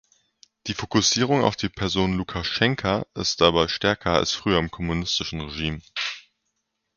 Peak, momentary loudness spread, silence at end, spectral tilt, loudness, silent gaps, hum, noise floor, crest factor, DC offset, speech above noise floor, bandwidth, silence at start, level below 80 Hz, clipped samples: -2 dBFS; 10 LU; 0.75 s; -4 dB/octave; -23 LUFS; none; none; -77 dBFS; 22 dB; under 0.1%; 54 dB; 7.2 kHz; 0.65 s; -44 dBFS; under 0.1%